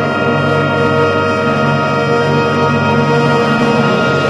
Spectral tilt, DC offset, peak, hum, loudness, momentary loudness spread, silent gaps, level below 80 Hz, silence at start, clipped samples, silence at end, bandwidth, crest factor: -6.5 dB/octave; under 0.1%; 0 dBFS; none; -12 LUFS; 2 LU; none; -46 dBFS; 0 s; under 0.1%; 0 s; 11.5 kHz; 12 dB